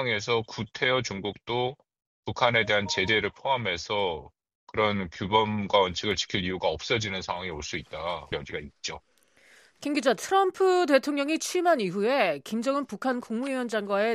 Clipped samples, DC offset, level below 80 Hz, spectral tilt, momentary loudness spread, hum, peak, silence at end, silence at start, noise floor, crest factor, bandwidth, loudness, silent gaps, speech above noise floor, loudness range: under 0.1%; under 0.1%; -56 dBFS; -4 dB/octave; 11 LU; none; -6 dBFS; 0 s; 0 s; -59 dBFS; 22 dB; 14.5 kHz; -27 LUFS; 2.07-2.23 s, 4.55-4.67 s; 32 dB; 6 LU